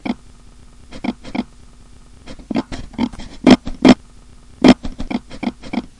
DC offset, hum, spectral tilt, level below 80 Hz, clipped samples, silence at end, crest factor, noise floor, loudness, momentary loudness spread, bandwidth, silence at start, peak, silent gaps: under 0.1%; none; -6 dB/octave; -36 dBFS; under 0.1%; 0.2 s; 18 dB; -41 dBFS; -17 LUFS; 15 LU; 11 kHz; 0.05 s; 0 dBFS; none